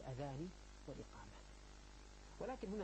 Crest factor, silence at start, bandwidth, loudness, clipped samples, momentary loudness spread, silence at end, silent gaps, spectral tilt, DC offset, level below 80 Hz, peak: 18 dB; 0 s; 8.8 kHz; -53 LUFS; under 0.1%; 13 LU; 0 s; none; -6 dB/octave; under 0.1%; -60 dBFS; -34 dBFS